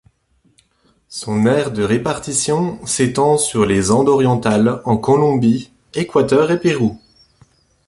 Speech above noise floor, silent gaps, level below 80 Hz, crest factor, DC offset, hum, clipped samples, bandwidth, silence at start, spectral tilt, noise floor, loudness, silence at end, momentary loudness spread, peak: 44 dB; none; -46 dBFS; 14 dB; under 0.1%; none; under 0.1%; 11.5 kHz; 1.1 s; -5.5 dB/octave; -59 dBFS; -16 LUFS; 0.9 s; 7 LU; -2 dBFS